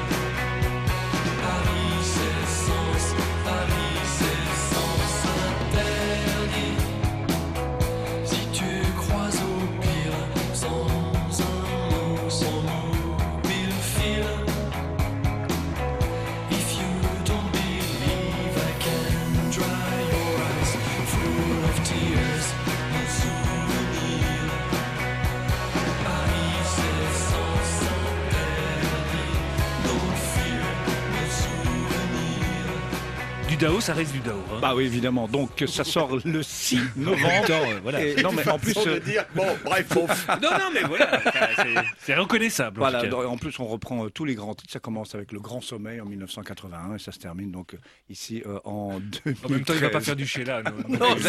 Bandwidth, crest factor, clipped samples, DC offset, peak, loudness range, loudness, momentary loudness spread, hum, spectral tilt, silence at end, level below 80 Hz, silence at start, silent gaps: 16 kHz; 20 dB; under 0.1%; under 0.1%; -4 dBFS; 6 LU; -25 LUFS; 9 LU; none; -4.5 dB/octave; 0 s; -34 dBFS; 0 s; none